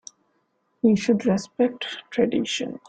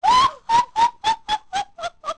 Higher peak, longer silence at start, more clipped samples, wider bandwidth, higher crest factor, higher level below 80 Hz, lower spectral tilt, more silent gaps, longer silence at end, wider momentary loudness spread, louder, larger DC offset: about the same, -8 dBFS vs -8 dBFS; first, 0.85 s vs 0 s; neither; second, 9.2 kHz vs 11 kHz; about the same, 16 dB vs 14 dB; second, -62 dBFS vs -50 dBFS; first, -5.5 dB/octave vs -1.5 dB/octave; neither; about the same, 0.1 s vs 0.05 s; second, 7 LU vs 12 LU; second, -23 LUFS vs -20 LUFS; second, under 0.1% vs 0.3%